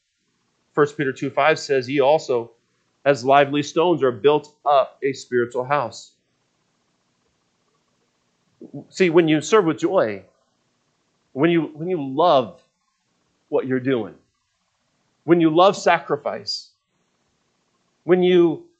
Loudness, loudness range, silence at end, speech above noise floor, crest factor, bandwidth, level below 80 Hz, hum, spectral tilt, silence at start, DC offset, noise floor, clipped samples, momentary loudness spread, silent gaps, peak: -20 LUFS; 6 LU; 0.15 s; 52 dB; 22 dB; 8.6 kHz; -74 dBFS; none; -5.5 dB/octave; 0.75 s; under 0.1%; -71 dBFS; under 0.1%; 14 LU; none; 0 dBFS